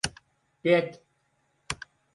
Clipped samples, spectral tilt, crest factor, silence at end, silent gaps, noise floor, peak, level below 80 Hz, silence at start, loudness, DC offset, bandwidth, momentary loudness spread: under 0.1%; -4 dB/octave; 22 dB; 0.4 s; none; -72 dBFS; -10 dBFS; -56 dBFS; 0.05 s; -29 LUFS; under 0.1%; 11.5 kHz; 14 LU